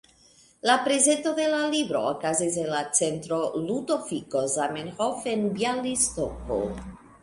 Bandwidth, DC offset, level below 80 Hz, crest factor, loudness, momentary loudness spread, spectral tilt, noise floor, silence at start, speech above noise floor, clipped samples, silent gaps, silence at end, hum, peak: 11.5 kHz; under 0.1%; -52 dBFS; 20 dB; -26 LUFS; 8 LU; -3 dB/octave; -58 dBFS; 0.65 s; 32 dB; under 0.1%; none; 0.15 s; none; -6 dBFS